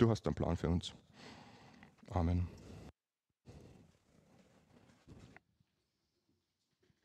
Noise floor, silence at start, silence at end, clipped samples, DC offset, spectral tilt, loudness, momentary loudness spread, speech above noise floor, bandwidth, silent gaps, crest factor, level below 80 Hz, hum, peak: under -90 dBFS; 0 s; 1.8 s; under 0.1%; under 0.1%; -7.5 dB/octave; -38 LUFS; 25 LU; over 54 dB; 9.8 kHz; none; 28 dB; -54 dBFS; none; -14 dBFS